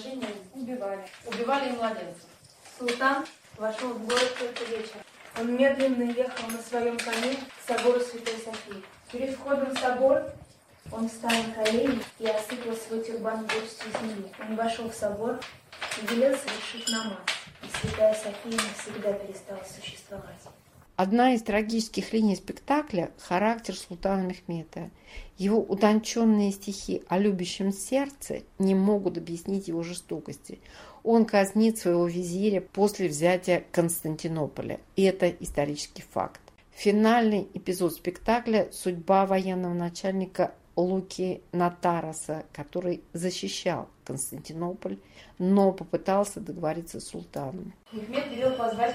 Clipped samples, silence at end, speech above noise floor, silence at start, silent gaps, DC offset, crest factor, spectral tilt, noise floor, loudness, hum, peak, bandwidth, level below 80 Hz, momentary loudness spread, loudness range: under 0.1%; 0 s; 22 dB; 0 s; none; under 0.1%; 20 dB; -5 dB/octave; -50 dBFS; -28 LUFS; none; -8 dBFS; 16 kHz; -58 dBFS; 14 LU; 5 LU